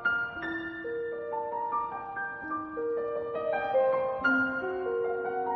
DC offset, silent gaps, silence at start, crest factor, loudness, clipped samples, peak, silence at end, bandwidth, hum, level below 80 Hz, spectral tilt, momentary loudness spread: under 0.1%; none; 0 s; 16 dB; -31 LUFS; under 0.1%; -16 dBFS; 0 s; 6.2 kHz; none; -66 dBFS; -3 dB/octave; 9 LU